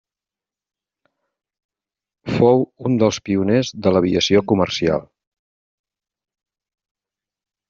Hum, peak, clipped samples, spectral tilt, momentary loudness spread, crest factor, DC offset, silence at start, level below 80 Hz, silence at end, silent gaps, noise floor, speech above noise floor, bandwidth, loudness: none; -2 dBFS; under 0.1%; -5.5 dB/octave; 6 LU; 18 dB; under 0.1%; 2.25 s; -54 dBFS; 2.7 s; none; -90 dBFS; 73 dB; 7.6 kHz; -18 LUFS